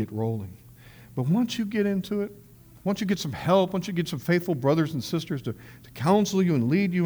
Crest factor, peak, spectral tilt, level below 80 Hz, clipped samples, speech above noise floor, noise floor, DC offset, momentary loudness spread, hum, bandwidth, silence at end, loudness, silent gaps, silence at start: 18 dB; -8 dBFS; -6.5 dB/octave; -58 dBFS; under 0.1%; 24 dB; -49 dBFS; under 0.1%; 12 LU; none; over 20 kHz; 0 s; -26 LUFS; none; 0 s